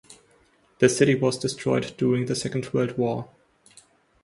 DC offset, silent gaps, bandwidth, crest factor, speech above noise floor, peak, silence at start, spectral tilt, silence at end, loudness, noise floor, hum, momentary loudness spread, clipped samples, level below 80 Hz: under 0.1%; none; 11.5 kHz; 22 dB; 38 dB; -4 dBFS; 0.1 s; -5.5 dB/octave; 0.95 s; -24 LUFS; -61 dBFS; none; 8 LU; under 0.1%; -60 dBFS